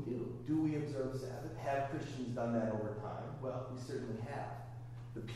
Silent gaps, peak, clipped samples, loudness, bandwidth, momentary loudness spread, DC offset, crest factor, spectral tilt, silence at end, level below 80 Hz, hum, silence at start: none; -24 dBFS; under 0.1%; -41 LUFS; 13 kHz; 10 LU; under 0.1%; 16 dB; -7.5 dB/octave; 0 s; -62 dBFS; none; 0 s